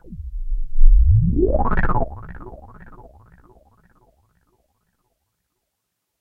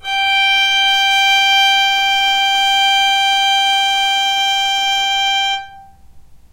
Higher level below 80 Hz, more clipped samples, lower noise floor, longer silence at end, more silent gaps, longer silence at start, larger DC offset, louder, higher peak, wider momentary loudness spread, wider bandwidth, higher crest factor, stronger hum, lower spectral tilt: first, -20 dBFS vs -50 dBFS; neither; first, -77 dBFS vs -40 dBFS; first, 3.65 s vs 0.15 s; neither; about the same, 0.1 s vs 0.05 s; neither; second, -20 LUFS vs -12 LUFS; first, 0 dBFS vs -4 dBFS; first, 22 LU vs 4 LU; second, 2.5 kHz vs 16 kHz; first, 18 dB vs 12 dB; neither; first, -11.5 dB/octave vs 3 dB/octave